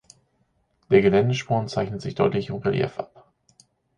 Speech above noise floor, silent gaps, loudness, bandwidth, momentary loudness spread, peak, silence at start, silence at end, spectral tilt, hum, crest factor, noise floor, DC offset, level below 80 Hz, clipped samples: 46 dB; none; -23 LUFS; 9.6 kHz; 11 LU; -4 dBFS; 0.9 s; 0.95 s; -7 dB/octave; none; 20 dB; -68 dBFS; under 0.1%; -54 dBFS; under 0.1%